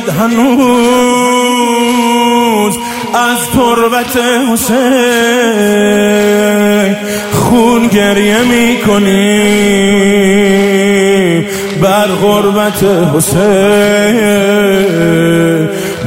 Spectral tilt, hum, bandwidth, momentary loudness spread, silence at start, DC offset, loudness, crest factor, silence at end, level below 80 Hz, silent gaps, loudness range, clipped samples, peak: -4.5 dB/octave; none; 16.5 kHz; 3 LU; 0 s; under 0.1%; -9 LUFS; 8 dB; 0 s; -40 dBFS; none; 2 LU; under 0.1%; 0 dBFS